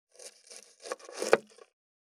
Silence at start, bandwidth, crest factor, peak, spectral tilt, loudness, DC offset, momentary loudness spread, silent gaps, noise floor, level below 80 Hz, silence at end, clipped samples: 0.2 s; 16 kHz; 30 dB; -4 dBFS; -2 dB/octave; -32 LUFS; under 0.1%; 21 LU; none; -54 dBFS; -86 dBFS; 0.7 s; under 0.1%